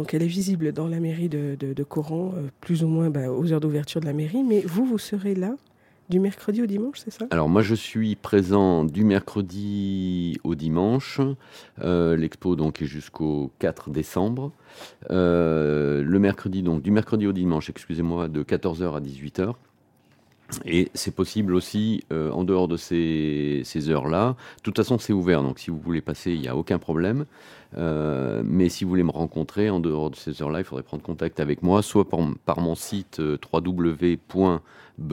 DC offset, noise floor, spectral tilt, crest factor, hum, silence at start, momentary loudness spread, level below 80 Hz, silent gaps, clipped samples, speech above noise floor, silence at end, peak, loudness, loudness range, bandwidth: under 0.1%; -60 dBFS; -7 dB/octave; 20 dB; none; 0 s; 9 LU; -52 dBFS; none; under 0.1%; 36 dB; 0 s; -4 dBFS; -25 LUFS; 4 LU; 16.5 kHz